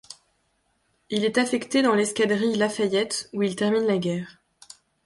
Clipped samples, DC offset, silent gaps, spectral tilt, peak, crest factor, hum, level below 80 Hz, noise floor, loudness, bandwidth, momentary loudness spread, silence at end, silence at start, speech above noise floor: under 0.1%; under 0.1%; none; -4.5 dB/octave; -8 dBFS; 18 dB; none; -68 dBFS; -70 dBFS; -24 LUFS; 11.5 kHz; 7 LU; 0.75 s; 0.1 s; 47 dB